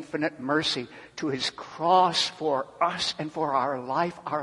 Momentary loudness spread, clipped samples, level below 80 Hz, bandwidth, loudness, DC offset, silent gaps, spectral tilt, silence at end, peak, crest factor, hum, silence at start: 10 LU; under 0.1%; -66 dBFS; 11.5 kHz; -27 LUFS; under 0.1%; none; -3.5 dB/octave; 0 s; -8 dBFS; 18 dB; none; 0 s